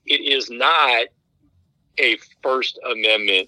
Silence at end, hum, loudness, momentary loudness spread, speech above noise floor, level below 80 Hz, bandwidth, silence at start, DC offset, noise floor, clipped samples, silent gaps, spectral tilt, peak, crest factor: 0 s; none; -18 LUFS; 8 LU; 43 dB; -72 dBFS; 13 kHz; 0.05 s; under 0.1%; -62 dBFS; under 0.1%; none; -1 dB/octave; -4 dBFS; 18 dB